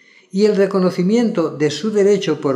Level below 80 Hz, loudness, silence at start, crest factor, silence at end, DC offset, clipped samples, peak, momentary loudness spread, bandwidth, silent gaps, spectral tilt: -72 dBFS; -17 LUFS; 0.35 s; 14 dB; 0 s; under 0.1%; under 0.1%; -2 dBFS; 4 LU; 11 kHz; none; -6.5 dB/octave